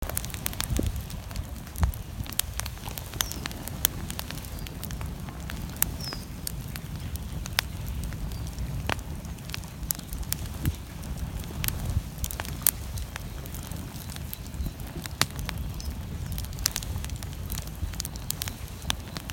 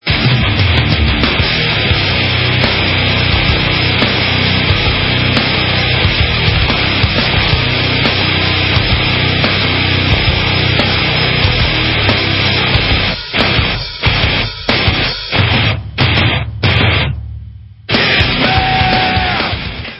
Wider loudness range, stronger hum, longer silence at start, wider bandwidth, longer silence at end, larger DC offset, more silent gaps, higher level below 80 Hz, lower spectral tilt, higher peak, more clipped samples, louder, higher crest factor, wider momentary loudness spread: about the same, 3 LU vs 2 LU; neither; about the same, 0 s vs 0.05 s; first, 17 kHz vs 8 kHz; about the same, 0 s vs 0 s; neither; neither; second, -38 dBFS vs -22 dBFS; second, -3.5 dB/octave vs -7 dB/octave; about the same, 0 dBFS vs 0 dBFS; neither; second, -32 LUFS vs -11 LUFS; first, 32 dB vs 12 dB; first, 9 LU vs 3 LU